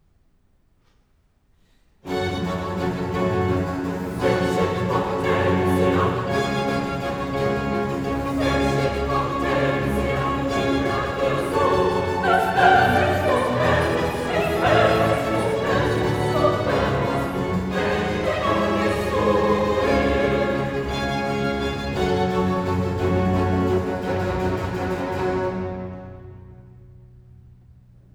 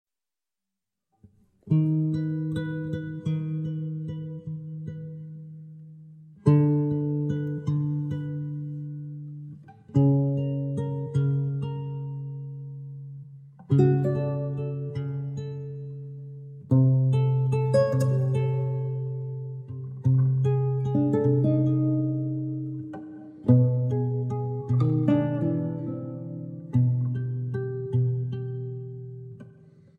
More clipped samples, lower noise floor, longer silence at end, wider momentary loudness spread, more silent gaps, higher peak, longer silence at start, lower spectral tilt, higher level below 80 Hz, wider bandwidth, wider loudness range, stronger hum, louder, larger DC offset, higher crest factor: neither; second, -62 dBFS vs under -90 dBFS; first, 1.25 s vs 0.5 s; second, 6 LU vs 17 LU; neither; first, -4 dBFS vs -8 dBFS; first, 2.05 s vs 1.65 s; second, -6.5 dB/octave vs -10.5 dB/octave; first, -38 dBFS vs -62 dBFS; first, over 20 kHz vs 7 kHz; about the same, 7 LU vs 5 LU; neither; first, -22 LUFS vs -26 LUFS; neither; about the same, 18 dB vs 20 dB